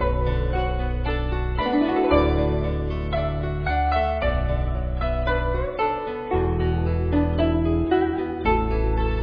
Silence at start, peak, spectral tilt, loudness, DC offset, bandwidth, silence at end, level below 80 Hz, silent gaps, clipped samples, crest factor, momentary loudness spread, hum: 0 s; -4 dBFS; -10 dB/octave; -23 LUFS; under 0.1%; 5.2 kHz; 0 s; -26 dBFS; none; under 0.1%; 18 dB; 5 LU; none